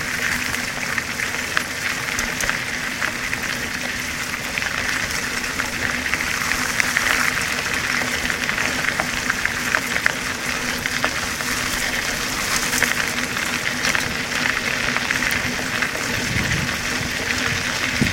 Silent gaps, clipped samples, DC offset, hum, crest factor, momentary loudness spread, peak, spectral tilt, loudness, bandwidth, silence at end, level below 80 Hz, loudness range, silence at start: none; under 0.1%; 0.1%; none; 22 dB; 4 LU; 0 dBFS; -2 dB/octave; -21 LUFS; 17 kHz; 0 s; -42 dBFS; 3 LU; 0 s